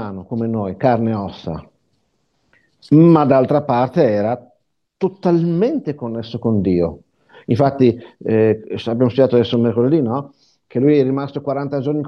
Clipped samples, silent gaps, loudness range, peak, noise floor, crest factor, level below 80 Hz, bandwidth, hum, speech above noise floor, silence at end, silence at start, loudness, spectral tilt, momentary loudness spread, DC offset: under 0.1%; none; 3 LU; 0 dBFS; -66 dBFS; 16 dB; -56 dBFS; 6.4 kHz; none; 50 dB; 0 s; 0 s; -17 LUFS; -9.5 dB/octave; 12 LU; under 0.1%